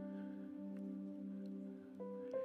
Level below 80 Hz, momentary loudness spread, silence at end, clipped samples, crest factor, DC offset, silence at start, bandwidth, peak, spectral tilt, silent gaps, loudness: under -90 dBFS; 3 LU; 0 s; under 0.1%; 14 dB; under 0.1%; 0 s; 6 kHz; -34 dBFS; -10 dB/octave; none; -49 LUFS